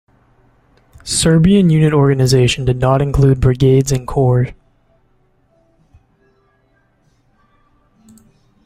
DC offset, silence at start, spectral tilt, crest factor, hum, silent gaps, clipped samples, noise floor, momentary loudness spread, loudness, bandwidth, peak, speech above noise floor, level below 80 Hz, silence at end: under 0.1%; 1.05 s; -6 dB/octave; 16 dB; none; none; under 0.1%; -58 dBFS; 7 LU; -13 LUFS; 15 kHz; 0 dBFS; 46 dB; -32 dBFS; 4.1 s